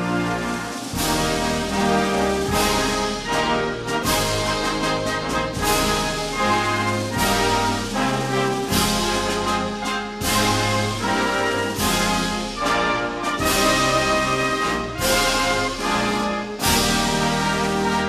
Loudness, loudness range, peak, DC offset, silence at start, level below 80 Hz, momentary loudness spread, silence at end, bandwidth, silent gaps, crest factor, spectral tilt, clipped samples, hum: -21 LUFS; 2 LU; -6 dBFS; under 0.1%; 0 s; -36 dBFS; 5 LU; 0 s; 15 kHz; none; 16 dB; -3.5 dB/octave; under 0.1%; none